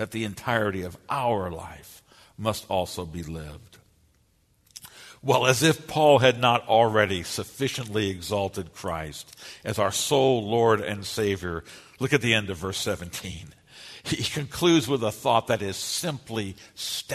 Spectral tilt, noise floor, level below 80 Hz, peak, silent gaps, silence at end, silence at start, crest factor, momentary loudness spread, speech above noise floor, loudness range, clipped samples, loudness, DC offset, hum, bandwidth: -4 dB/octave; -65 dBFS; -54 dBFS; -4 dBFS; none; 0 s; 0 s; 22 dB; 18 LU; 39 dB; 9 LU; under 0.1%; -25 LUFS; under 0.1%; none; 13.5 kHz